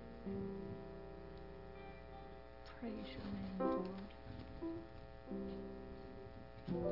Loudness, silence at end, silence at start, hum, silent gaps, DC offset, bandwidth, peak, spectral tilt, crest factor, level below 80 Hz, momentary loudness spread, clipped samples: -48 LUFS; 0 s; 0 s; none; none; under 0.1%; 5.8 kHz; -26 dBFS; -6.5 dB/octave; 22 dB; -60 dBFS; 13 LU; under 0.1%